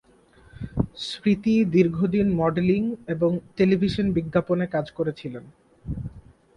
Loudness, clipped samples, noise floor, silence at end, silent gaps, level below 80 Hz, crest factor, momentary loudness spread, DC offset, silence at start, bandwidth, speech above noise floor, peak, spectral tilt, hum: -24 LUFS; under 0.1%; -55 dBFS; 0.35 s; none; -46 dBFS; 18 dB; 15 LU; under 0.1%; 0.55 s; 10.5 kHz; 32 dB; -6 dBFS; -8 dB/octave; none